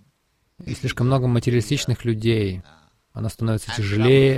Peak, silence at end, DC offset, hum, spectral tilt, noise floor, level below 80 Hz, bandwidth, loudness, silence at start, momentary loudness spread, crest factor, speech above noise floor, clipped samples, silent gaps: -4 dBFS; 0 s; under 0.1%; none; -6.5 dB/octave; -67 dBFS; -44 dBFS; 13.5 kHz; -22 LUFS; 0.6 s; 14 LU; 16 dB; 47 dB; under 0.1%; none